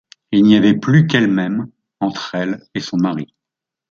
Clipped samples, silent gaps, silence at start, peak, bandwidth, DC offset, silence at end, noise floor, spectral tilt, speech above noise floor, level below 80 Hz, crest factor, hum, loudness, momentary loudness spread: under 0.1%; none; 0.3 s; 0 dBFS; 7.2 kHz; under 0.1%; 0.65 s; -84 dBFS; -7 dB/octave; 69 dB; -56 dBFS; 16 dB; none; -16 LUFS; 13 LU